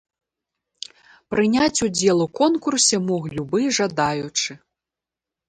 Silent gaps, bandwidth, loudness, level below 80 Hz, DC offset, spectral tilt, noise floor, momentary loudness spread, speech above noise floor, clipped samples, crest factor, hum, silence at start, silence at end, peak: none; 11 kHz; -20 LUFS; -56 dBFS; under 0.1%; -3.5 dB/octave; -88 dBFS; 13 LU; 67 dB; under 0.1%; 18 dB; none; 1.3 s; 0.9 s; -4 dBFS